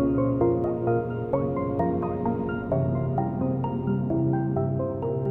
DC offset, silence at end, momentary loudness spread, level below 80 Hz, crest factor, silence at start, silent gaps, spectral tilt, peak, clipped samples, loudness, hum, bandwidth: under 0.1%; 0 s; 4 LU; -46 dBFS; 16 dB; 0 s; none; -12.5 dB/octave; -10 dBFS; under 0.1%; -26 LUFS; none; 3 kHz